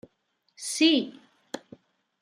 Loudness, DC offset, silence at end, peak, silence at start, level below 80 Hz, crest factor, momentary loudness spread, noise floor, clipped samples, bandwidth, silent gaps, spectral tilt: -24 LUFS; under 0.1%; 0.65 s; -10 dBFS; 0.6 s; -82 dBFS; 20 dB; 20 LU; -74 dBFS; under 0.1%; 15 kHz; none; -2 dB/octave